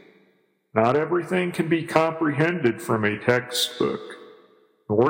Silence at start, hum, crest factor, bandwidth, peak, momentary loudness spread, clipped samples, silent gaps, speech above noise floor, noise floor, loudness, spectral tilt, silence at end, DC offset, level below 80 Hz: 0.75 s; none; 22 dB; 16.5 kHz; -2 dBFS; 6 LU; under 0.1%; none; 41 dB; -64 dBFS; -23 LUFS; -5 dB/octave; 0 s; under 0.1%; -66 dBFS